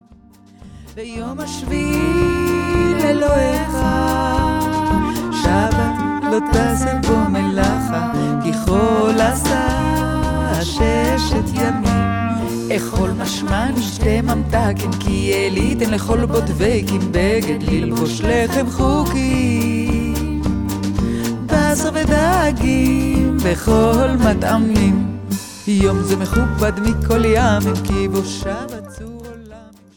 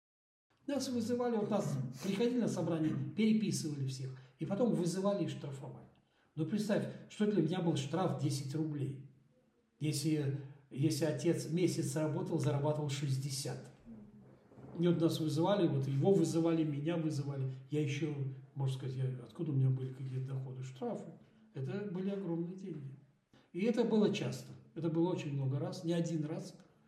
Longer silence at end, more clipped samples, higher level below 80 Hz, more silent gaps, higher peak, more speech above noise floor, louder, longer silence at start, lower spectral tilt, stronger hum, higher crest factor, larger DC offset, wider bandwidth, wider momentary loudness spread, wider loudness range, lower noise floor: about the same, 0.3 s vs 0.25 s; neither; first, -26 dBFS vs -78 dBFS; neither; first, -2 dBFS vs -18 dBFS; second, 30 dB vs 37 dB; first, -17 LUFS vs -36 LUFS; about the same, 0.6 s vs 0.7 s; about the same, -6 dB/octave vs -6.5 dB/octave; neither; about the same, 16 dB vs 18 dB; first, 0.2% vs under 0.1%; first, 19.5 kHz vs 14.5 kHz; second, 6 LU vs 14 LU; about the same, 3 LU vs 5 LU; second, -46 dBFS vs -73 dBFS